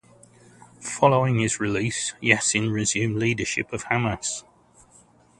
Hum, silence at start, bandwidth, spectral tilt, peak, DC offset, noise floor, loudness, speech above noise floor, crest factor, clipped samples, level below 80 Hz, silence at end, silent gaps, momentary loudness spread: none; 0.8 s; 11.5 kHz; -4 dB/octave; 0 dBFS; under 0.1%; -56 dBFS; -23 LUFS; 32 dB; 24 dB; under 0.1%; -52 dBFS; 1 s; none; 10 LU